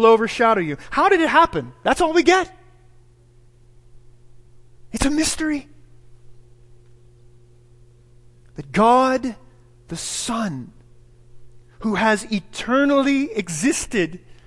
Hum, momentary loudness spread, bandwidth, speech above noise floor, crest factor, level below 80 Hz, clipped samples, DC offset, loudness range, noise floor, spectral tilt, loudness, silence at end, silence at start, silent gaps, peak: none; 14 LU; 12 kHz; 32 dB; 20 dB; -44 dBFS; under 0.1%; under 0.1%; 8 LU; -51 dBFS; -4 dB/octave; -19 LUFS; 0.15 s; 0 s; none; -2 dBFS